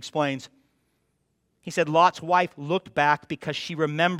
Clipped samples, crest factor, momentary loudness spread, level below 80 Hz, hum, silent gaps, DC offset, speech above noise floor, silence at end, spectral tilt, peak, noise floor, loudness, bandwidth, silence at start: under 0.1%; 20 dB; 11 LU; -70 dBFS; none; none; under 0.1%; 48 dB; 0 s; -5 dB/octave; -6 dBFS; -73 dBFS; -24 LUFS; 14 kHz; 0 s